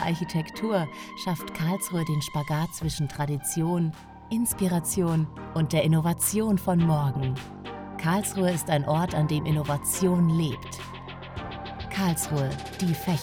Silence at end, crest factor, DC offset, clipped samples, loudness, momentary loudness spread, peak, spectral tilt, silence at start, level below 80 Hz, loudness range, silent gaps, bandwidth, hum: 0 s; 16 dB; under 0.1%; under 0.1%; -27 LUFS; 13 LU; -10 dBFS; -5.5 dB/octave; 0 s; -50 dBFS; 4 LU; none; 19.5 kHz; none